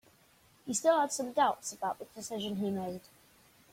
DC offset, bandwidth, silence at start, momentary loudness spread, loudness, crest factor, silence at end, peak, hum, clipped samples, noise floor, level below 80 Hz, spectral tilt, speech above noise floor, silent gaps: under 0.1%; 16.5 kHz; 0.65 s; 14 LU; -33 LUFS; 20 dB; 0.75 s; -14 dBFS; none; under 0.1%; -65 dBFS; -74 dBFS; -3.5 dB/octave; 32 dB; none